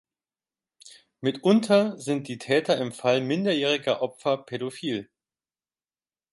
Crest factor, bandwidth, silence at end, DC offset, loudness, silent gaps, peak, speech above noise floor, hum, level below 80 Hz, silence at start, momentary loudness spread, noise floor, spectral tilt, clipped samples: 18 dB; 11.5 kHz; 1.3 s; under 0.1%; -25 LUFS; none; -8 dBFS; over 65 dB; none; -72 dBFS; 0.85 s; 9 LU; under -90 dBFS; -5.5 dB/octave; under 0.1%